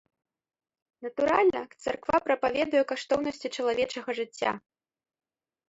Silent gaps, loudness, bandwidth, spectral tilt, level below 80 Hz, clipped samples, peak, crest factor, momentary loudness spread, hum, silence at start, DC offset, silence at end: none; -28 LUFS; 8 kHz; -4 dB/octave; -64 dBFS; under 0.1%; -8 dBFS; 20 dB; 10 LU; none; 1 s; under 0.1%; 1.1 s